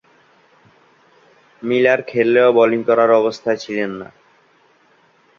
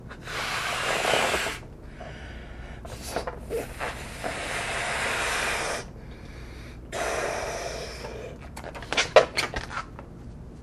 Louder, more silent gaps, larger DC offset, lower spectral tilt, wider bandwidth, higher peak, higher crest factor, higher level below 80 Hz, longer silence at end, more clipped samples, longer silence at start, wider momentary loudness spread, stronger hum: first, -16 LUFS vs -28 LUFS; neither; neither; first, -6 dB/octave vs -2.5 dB/octave; second, 7.4 kHz vs 15.5 kHz; about the same, -2 dBFS vs 0 dBFS; second, 18 dB vs 30 dB; second, -64 dBFS vs -44 dBFS; first, 1.35 s vs 0 s; neither; first, 1.65 s vs 0 s; second, 14 LU vs 19 LU; neither